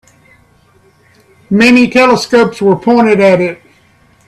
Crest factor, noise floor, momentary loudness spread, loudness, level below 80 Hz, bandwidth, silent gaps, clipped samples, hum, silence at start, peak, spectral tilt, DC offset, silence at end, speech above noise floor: 12 dB; -48 dBFS; 6 LU; -9 LUFS; -48 dBFS; 13 kHz; none; under 0.1%; none; 1.5 s; 0 dBFS; -5.5 dB/octave; under 0.1%; 0.75 s; 40 dB